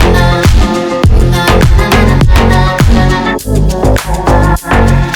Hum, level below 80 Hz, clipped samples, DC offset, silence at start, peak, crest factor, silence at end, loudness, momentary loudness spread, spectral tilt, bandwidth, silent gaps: none; -10 dBFS; 1%; under 0.1%; 0 s; 0 dBFS; 6 dB; 0 s; -9 LUFS; 4 LU; -6 dB/octave; 19 kHz; none